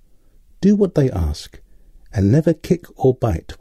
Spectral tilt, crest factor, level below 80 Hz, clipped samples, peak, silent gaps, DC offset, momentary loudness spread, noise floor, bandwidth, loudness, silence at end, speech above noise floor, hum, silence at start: -8.5 dB/octave; 14 dB; -34 dBFS; under 0.1%; -4 dBFS; none; under 0.1%; 11 LU; -49 dBFS; 13.5 kHz; -18 LUFS; 0.05 s; 32 dB; none; 0.6 s